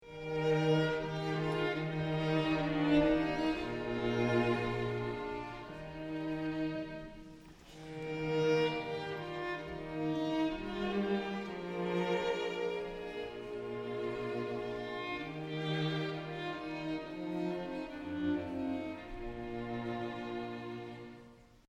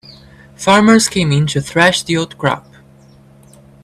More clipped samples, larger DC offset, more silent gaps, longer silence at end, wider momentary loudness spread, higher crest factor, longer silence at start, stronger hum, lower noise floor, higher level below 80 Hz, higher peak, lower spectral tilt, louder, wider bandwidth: neither; neither; neither; second, 0.2 s vs 1.25 s; first, 13 LU vs 10 LU; about the same, 18 dB vs 16 dB; about the same, 0 s vs 0.1 s; neither; first, -58 dBFS vs -44 dBFS; second, -56 dBFS vs -46 dBFS; second, -18 dBFS vs 0 dBFS; first, -7 dB/octave vs -4.5 dB/octave; second, -36 LUFS vs -13 LUFS; second, 11 kHz vs 14 kHz